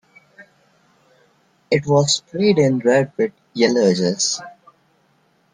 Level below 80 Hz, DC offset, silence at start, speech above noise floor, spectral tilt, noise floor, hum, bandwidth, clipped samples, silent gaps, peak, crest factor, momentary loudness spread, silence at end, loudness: -60 dBFS; under 0.1%; 0.4 s; 43 dB; -4.5 dB/octave; -60 dBFS; none; 10 kHz; under 0.1%; none; -2 dBFS; 18 dB; 7 LU; 1.05 s; -18 LUFS